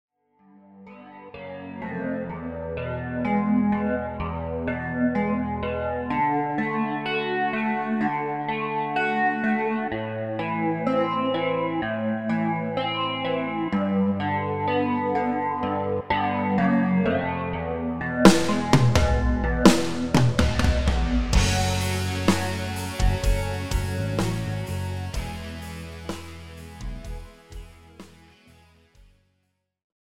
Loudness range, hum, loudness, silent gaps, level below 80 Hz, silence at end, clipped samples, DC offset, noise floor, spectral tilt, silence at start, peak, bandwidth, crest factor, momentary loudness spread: 13 LU; none; -24 LUFS; none; -34 dBFS; 1.95 s; under 0.1%; under 0.1%; -74 dBFS; -5.5 dB/octave; 0.55 s; 0 dBFS; 16 kHz; 24 dB; 14 LU